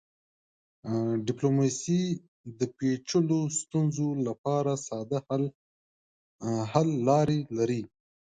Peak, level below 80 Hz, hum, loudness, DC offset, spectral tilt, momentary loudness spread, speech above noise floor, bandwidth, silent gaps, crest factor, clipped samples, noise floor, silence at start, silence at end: -8 dBFS; -66 dBFS; none; -29 LUFS; under 0.1%; -6.5 dB/octave; 9 LU; over 62 dB; 9.4 kHz; 2.28-2.44 s, 4.38-4.44 s, 5.55-6.39 s; 20 dB; under 0.1%; under -90 dBFS; 0.85 s; 0.4 s